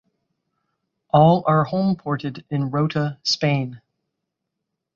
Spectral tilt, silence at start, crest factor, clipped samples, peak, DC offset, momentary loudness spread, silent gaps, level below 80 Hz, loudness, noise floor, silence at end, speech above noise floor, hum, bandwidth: -6.5 dB/octave; 1.15 s; 20 dB; under 0.1%; -2 dBFS; under 0.1%; 11 LU; none; -58 dBFS; -20 LUFS; -81 dBFS; 1.2 s; 61 dB; none; 7.4 kHz